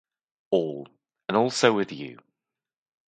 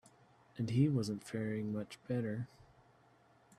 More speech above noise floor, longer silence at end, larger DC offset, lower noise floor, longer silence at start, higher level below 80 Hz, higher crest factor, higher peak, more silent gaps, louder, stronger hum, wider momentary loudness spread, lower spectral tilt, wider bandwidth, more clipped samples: first, 65 dB vs 31 dB; second, 0.95 s vs 1.15 s; neither; first, -89 dBFS vs -67 dBFS; about the same, 0.5 s vs 0.55 s; about the same, -72 dBFS vs -72 dBFS; first, 26 dB vs 20 dB; first, -2 dBFS vs -20 dBFS; neither; first, -25 LUFS vs -38 LUFS; neither; first, 18 LU vs 12 LU; second, -4.5 dB/octave vs -7.5 dB/octave; second, 9.4 kHz vs 13.5 kHz; neither